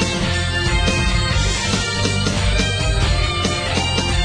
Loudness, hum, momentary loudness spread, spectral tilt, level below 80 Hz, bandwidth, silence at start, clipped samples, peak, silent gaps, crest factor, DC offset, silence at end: -18 LUFS; none; 2 LU; -4 dB/octave; -24 dBFS; 10.5 kHz; 0 s; under 0.1%; -4 dBFS; none; 14 dB; under 0.1%; 0 s